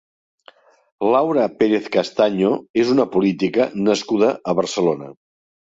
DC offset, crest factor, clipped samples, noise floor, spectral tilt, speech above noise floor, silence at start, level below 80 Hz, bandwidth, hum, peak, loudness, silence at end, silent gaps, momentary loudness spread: under 0.1%; 16 dB; under 0.1%; -51 dBFS; -5.5 dB/octave; 33 dB; 1 s; -62 dBFS; 8 kHz; none; -4 dBFS; -19 LUFS; 0.65 s; 2.70-2.74 s; 5 LU